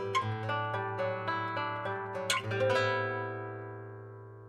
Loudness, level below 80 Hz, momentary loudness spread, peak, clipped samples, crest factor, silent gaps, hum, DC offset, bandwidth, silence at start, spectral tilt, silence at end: -33 LUFS; -72 dBFS; 15 LU; -16 dBFS; under 0.1%; 18 dB; none; none; under 0.1%; 16 kHz; 0 s; -4.5 dB/octave; 0 s